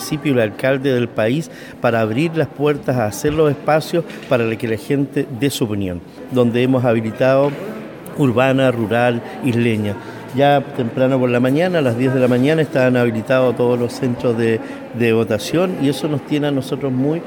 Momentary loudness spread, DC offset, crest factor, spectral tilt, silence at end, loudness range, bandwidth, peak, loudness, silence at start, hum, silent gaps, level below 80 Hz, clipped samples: 7 LU; under 0.1%; 16 dB; -6.5 dB/octave; 0 s; 3 LU; 19 kHz; -2 dBFS; -17 LUFS; 0 s; none; none; -52 dBFS; under 0.1%